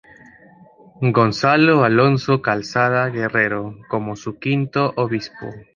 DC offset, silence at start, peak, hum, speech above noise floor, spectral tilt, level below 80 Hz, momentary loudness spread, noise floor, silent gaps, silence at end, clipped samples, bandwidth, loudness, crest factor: under 0.1%; 1 s; -2 dBFS; none; 29 dB; -7 dB/octave; -56 dBFS; 12 LU; -48 dBFS; none; 0.15 s; under 0.1%; 7.4 kHz; -18 LUFS; 18 dB